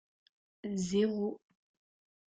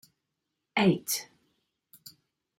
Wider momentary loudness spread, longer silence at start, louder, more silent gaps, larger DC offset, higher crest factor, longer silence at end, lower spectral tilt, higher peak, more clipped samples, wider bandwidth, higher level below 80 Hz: second, 15 LU vs 25 LU; about the same, 0.65 s vs 0.75 s; second, -34 LUFS vs -28 LUFS; neither; neither; about the same, 18 dB vs 20 dB; second, 0.9 s vs 1.35 s; first, -6 dB/octave vs -4.5 dB/octave; second, -20 dBFS vs -12 dBFS; neither; second, 9.2 kHz vs 16.5 kHz; about the same, -70 dBFS vs -74 dBFS